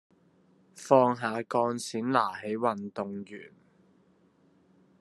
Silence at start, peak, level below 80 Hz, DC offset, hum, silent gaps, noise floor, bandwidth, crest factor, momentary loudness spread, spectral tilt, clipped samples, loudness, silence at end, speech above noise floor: 0.75 s; -8 dBFS; -78 dBFS; under 0.1%; none; none; -65 dBFS; 12.5 kHz; 24 dB; 19 LU; -5.5 dB/octave; under 0.1%; -28 LUFS; 1.55 s; 36 dB